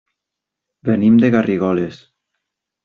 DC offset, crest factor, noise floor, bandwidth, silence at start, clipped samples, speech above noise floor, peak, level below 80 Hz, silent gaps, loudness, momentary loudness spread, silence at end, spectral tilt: under 0.1%; 14 dB; -82 dBFS; 6.4 kHz; 0.85 s; under 0.1%; 68 dB; -4 dBFS; -56 dBFS; none; -15 LUFS; 13 LU; 0.9 s; -7.5 dB/octave